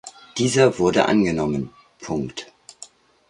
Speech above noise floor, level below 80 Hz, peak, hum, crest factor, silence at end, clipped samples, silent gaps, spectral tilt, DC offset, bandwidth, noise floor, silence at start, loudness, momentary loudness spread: 27 dB; -50 dBFS; -2 dBFS; none; 20 dB; 0.45 s; under 0.1%; none; -5 dB/octave; under 0.1%; 11.5 kHz; -47 dBFS; 0.05 s; -20 LUFS; 21 LU